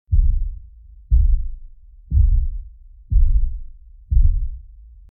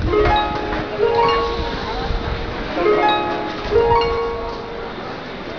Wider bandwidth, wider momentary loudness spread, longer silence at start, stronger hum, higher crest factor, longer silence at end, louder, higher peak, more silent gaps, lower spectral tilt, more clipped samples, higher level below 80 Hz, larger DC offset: second, 0.4 kHz vs 5.4 kHz; first, 19 LU vs 12 LU; about the same, 0.1 s vs 0 s; neither; about the same, 14 dB vs 16 dB; first, 0.45 s vs 0 s; about the same, -22 LUFS vs -20 LUFS; about the same, -4 dBFS vs -4 dBFS; neither; first, -14 dB/octave vs -6.5 dB/octave; neither; first, -18 dBFS vs -30 dBFS; second, under 0.1% vs 0.5%